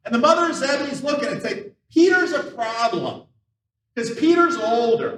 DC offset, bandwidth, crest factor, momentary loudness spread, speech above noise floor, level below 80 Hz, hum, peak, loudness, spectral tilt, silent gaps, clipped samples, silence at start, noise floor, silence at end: under 0.1%; 10.5 kHz; 18 dB; 13 LU; 58 dB; -72 dBFS; none; -2 dBFS; -20 LUFS; -4 dB/octave; none; under 0.1%; 0.05 s; -77 dBFS; 0 s